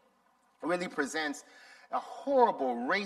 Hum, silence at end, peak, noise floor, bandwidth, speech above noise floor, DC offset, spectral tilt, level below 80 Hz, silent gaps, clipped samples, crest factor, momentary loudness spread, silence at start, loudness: none; 0 s; -12 dBFS; -69 dBFS; 13.5 kHz; 38 dB; under 0.1%; -4 dB/octave; -80 dBFS; none; under 0.1%; 22 dB; 12 LU; 0.6 s; -32 LUFS